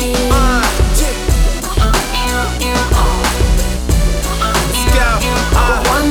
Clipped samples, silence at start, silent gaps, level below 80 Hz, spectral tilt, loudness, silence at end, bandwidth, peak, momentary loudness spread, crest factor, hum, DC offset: under 0.1%; 0 s; none; -14 dBFS; -4 dB/octave; -14 LUFS; 0 s; 19 kHz; -2 dBFS; 4 LU; 10 dB; none; under 0.1%